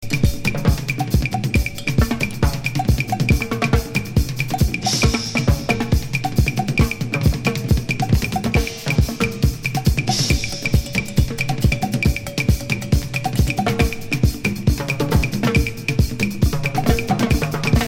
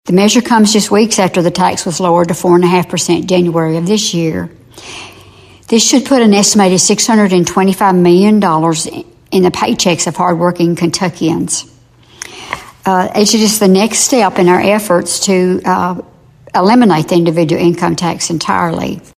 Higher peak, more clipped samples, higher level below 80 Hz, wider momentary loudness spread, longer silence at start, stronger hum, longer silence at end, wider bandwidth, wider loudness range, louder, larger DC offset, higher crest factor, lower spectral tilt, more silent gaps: about the same, -2 dBFS vs 0 dBFS; neither; first, -26 dBFS vs -48 dBFS; second, 2 LU vs 10 LU; about the same, 0 s vs 0.05 s; neither; second, 0 s vs 0.2 s; first, 17 kHz vs 14.5 kHz; second, 1 LU vs 5 LU; second, -20 LUFS vs -11 LUFS; neither; about the same, 16 dB vs 12 dB; about the same, -5.5 dB/octave vs -4.5 dB/octave; neither